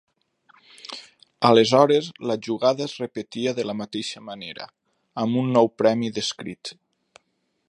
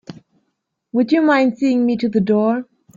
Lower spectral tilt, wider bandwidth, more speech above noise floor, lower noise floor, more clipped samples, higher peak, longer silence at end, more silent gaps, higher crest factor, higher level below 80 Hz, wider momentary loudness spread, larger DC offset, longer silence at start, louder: second, -5 dB/octave vs -7.5 dB/octave; first, 11 kHz vs 7.6 kHz; second, 50 dB vs 57 dB; about the same, -72 dBFS vs -73 dBFS; neither; about the same, -2 dBFS vs -2 dBFS; first, 0.95 s vs 0.35 s; neither; first, 22 dB vs 16 dB; second, -68 dBFS vs -62 dBFS; first, 20 LU vs 7 LU; neither; first, 0.9 s vs 0.1 s; second, -22 LUFS vs -17 LUFS